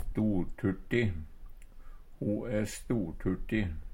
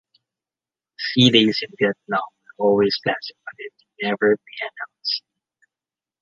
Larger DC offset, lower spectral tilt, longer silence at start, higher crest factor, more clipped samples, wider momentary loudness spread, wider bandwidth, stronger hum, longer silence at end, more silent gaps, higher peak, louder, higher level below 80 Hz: neither; first, -7 dB/octave vs -5.5 dB/octave; second, 0 s vs 1 s; about the same, 18 dB vs 22 dB; neither; second, 5 LU vs 21 LU; first, 16 kHz vs 7.4 kHz; neither; second, 0 s vs 1 s; neither; second, -14 dBFS vs -2 dBFS; second, -33 LUFS vs -20 LUFS; first, -42 dBFS vs -62 dBFS